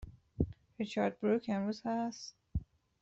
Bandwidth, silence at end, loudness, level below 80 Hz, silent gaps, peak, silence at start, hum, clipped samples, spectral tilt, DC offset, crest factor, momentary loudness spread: 8 kHz; 0.4 s; -37 LUFS; -52 dBFS; none; -18 dBFS; 0 s; none; under 0.1%; -6.5 dB/octave; under 0.1%; 20 dB; 10 LU